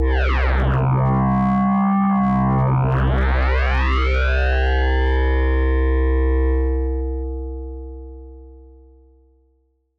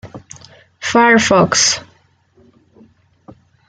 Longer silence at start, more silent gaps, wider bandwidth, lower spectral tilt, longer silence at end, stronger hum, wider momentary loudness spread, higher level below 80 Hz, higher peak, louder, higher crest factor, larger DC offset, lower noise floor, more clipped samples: about the same, 0 s vs 0.05 s; neither; second, 5.6 kHz vs 10 kHz; first, -9 dB/octave vs -2.5 dB/octave; second, 1.35 s vs 1.9 s; neither; second, 12 LU vs 21 LU; first, -20 dBFS vs -54 dBFS; second, -12 dBFS vs 0 dBFS; second, -19 LUFS vs -12 LUFS; second, 6 dB vs 16 dB; neither; first, -63 dBFS vs -54 dBFS; neither